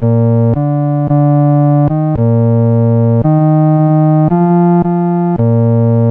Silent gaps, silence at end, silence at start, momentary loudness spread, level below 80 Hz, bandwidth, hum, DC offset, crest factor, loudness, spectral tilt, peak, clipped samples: none; 0 s; 0 s; 3 LU; -40 dBFS; 2.7 kHz; none; 0.1%; 8 dB; -10 LUFS; -13.5 dB/octave; -2 dBFS; under 0.1%